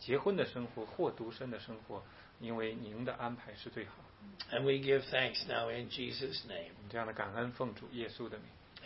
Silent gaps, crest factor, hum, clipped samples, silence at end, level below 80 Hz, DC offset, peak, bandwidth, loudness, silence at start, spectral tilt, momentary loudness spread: none; 22 dB; none; under 0.1%; 0 s; -68 dBFS; under 0.1%; -18 dBFS; 5.8 kHz; -39 LUFS; 0 s; -3 dB/octave; 15 LU